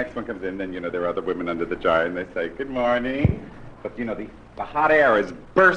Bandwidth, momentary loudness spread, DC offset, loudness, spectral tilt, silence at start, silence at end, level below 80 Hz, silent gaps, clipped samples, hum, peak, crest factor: 9.4 kHz; 16 LU; under 0.1%; -23 LUFS; -7.5 dB/octave; 0 s; 0 s; -42 dBFS; none; under 0.1%; none; -4 dBFS; 20 dB